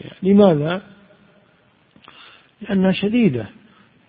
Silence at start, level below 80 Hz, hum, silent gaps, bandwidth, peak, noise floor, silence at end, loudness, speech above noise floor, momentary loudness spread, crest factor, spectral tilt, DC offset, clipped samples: 0.05 s; -54 dBFS; none; none; 4.9 kHz; 0 dBFS; -57 dBFS; 0.6 s; -17 LUFS; 41 dB; 16 LU; 20 dB; -12.5 dB/octave; under 0.1%; under 0.1%